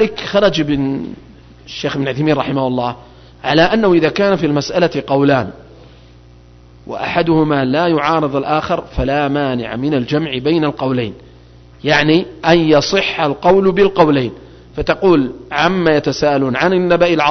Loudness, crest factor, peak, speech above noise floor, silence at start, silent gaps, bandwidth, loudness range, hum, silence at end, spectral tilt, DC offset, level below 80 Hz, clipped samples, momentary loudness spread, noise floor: -15 LUFS; 14 dB; 0 dBFS; 28 dB; 0 s; none; 6.4 kHz; 4 LU; none; 0 s; -6 dB/octave; under 0.1%; -38 dBFS; under 0.1%; 10 LU; -42 dBFS